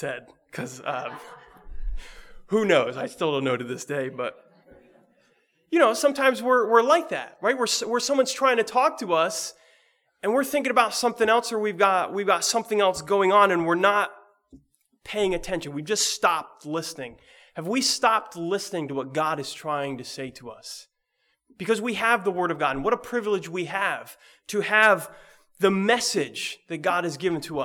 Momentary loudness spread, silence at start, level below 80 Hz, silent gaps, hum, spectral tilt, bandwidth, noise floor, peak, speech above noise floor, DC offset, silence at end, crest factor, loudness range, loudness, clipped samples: 16 LU; 0 s; -48 dBFS; none; none; -3 dB/octave; 19.5 kHz; -73 dBFS; -4 dBFS; 49 dB; under 0.1%; 0 s; 20 dB; 6 LU; -24 LUFS; under 0.1%